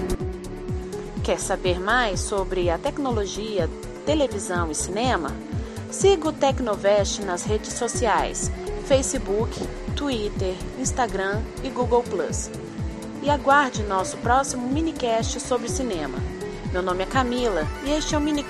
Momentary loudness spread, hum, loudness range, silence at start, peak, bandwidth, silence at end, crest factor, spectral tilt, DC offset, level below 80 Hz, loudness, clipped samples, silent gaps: 10 LU; none; 3 LU; 0 s; -4 dBFS; 13 kHz; 0 s; 18 dB; -4.5 dB/octave; under 0.1%; -36 dBFS; -24 LUFS; under 0.1%; none